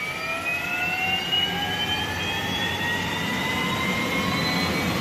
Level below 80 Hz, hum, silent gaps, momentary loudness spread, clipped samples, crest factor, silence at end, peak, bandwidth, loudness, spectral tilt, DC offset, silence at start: -48 dBFS; none; none; 3 LU; under 0.1%; 14 dB; 0 s; -12 dBFS; 15.5 kHz; -24 LUFS; -3.5 dB/octave; under 0.1%; 0 s